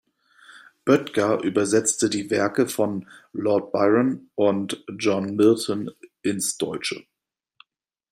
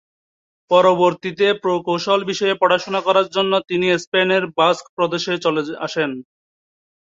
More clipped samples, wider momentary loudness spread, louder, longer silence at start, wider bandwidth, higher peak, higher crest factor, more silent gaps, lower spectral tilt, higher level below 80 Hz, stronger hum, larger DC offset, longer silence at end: neither; first, 11 LU vs 7 LU; second, -23 LUFS vs -18 LUFS; second, 0.55 s vs 0.7 s; first, 16 kHz vs 7.8 kHz; about the same, -4 dBFS vs -2 dBFS; about the same, 20 dB vs 16 dB; second, none vs 4.07-4.12 s, 4.89-4.97 s; about the same, -4.5 dB/octave vs -4.5 dB/octave; about the same, -68 dBFS vs -66 dBFS; neither; neither; first, 1.1 s vs 0.9 s